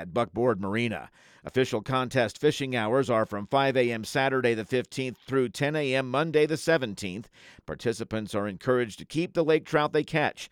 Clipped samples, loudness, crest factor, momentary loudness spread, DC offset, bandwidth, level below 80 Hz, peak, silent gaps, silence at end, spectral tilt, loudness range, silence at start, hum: under 0.1%; -27 LUFS; 18 dB; 8 LU; under 0.1%; 16.5 kHz; -62 dBFS; -10 dBFS; none; 0.05 s; -5.5 dB/octave; 3 LU; 0 s; none